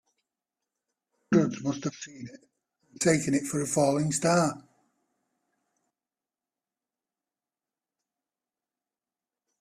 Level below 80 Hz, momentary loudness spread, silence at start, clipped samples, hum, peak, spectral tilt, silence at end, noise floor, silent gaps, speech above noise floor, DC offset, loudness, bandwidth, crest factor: -68 dBFS; 17 LU; 1.3 s; under 0.1%; none; -10 dBFS; -5 dB/octave; 5 s; under -90 dBFS; none; over 63 dB; under 0.1%; -27 LUFS; 15 kHz; 22 dB